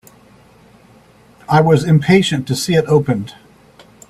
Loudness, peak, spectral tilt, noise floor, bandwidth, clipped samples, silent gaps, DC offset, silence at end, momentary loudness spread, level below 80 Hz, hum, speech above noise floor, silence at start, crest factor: -14 LUFS; 0 dBFS; -6 dB/octave; -47 dBFS; 14 kHz; under 0.1%; none; under 0.1%; 0.8 s; 9 LU; -50 dBFS; none; 34 dB; 1.5 s; 16 dB